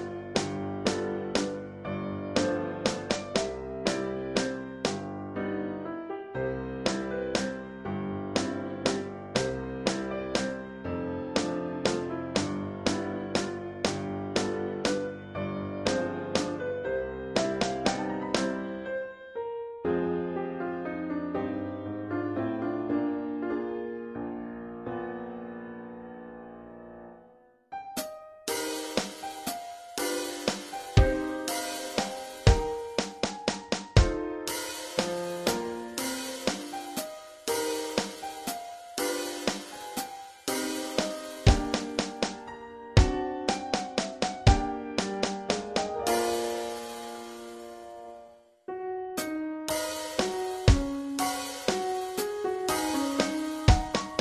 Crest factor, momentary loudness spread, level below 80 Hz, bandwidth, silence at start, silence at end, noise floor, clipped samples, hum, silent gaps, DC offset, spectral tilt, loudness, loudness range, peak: 26 dB; 12 LU; -40 dBFS; 14.5 kHz; 0 s; 0 s; -58 dBFS; under 0.1%; none; none; under 0.1%; -4.5 dB/octave; -31 LUFS; 6 LU; -6 dBFS